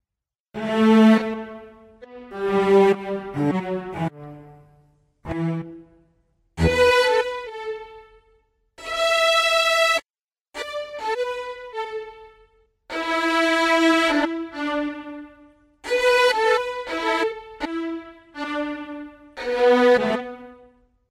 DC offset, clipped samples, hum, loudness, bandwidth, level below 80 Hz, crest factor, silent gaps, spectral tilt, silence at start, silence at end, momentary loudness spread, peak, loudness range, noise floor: under 0.1%; under 0.1%; none; -21 LUFS; 15.5 kHz; -48 dBFS; 18 dB; 10.22-10.28 s, 10.41-10.45 s; -4.5 dB/octave; 0.55 s; 0.55 s; 21 LU; -6 dBFS; 6 LU; under -90 dBFS